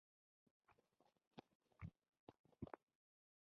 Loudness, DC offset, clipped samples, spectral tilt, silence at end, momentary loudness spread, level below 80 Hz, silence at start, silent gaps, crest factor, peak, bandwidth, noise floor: -62 LUFS; under 0.1%; under 0.1%; -7 dB/octave; 0.75 s; 8 LU; -76 dBFS; 0.7 s; 1.27-1.31 s, 1.55-1.60 s, 2.19-2.27 s, 2.39-2.44 s; 28 dB; -36 dBFS; 5.4 kHz; -82 dBFS